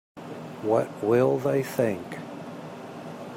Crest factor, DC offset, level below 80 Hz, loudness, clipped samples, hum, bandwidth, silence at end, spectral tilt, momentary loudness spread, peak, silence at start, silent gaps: 18 dB; under 0.1%; -70 dBFS; -25 LUFS; under 0.1%; none; 16 kHz; 0 s; -7 dB/octave; 17 LU; -10 dBFS; 0.15 s; none